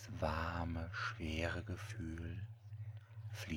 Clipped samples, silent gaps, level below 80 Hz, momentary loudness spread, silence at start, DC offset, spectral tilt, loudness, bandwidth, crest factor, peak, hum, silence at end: under 0.1%; none; -54 dBFS; 11 LU; 0 s; under 0.1%; -6 dB/octave; -44 LUFS; 19 kHz; 20 dB; -24 dBFS; none; 0 s